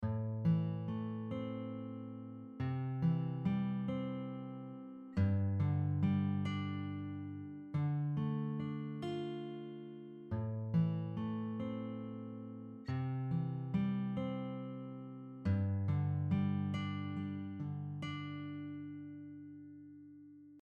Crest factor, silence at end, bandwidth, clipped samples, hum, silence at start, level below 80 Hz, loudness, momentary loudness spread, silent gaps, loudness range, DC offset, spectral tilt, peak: 16 dB; 0 s; 7 kHz; under 0.1%; none; 0 s; -68 dBFS; -39 LUFS; 14 LU; none; 4 LU; under 0.1%; -9.5 dB/octave; -22 dBFS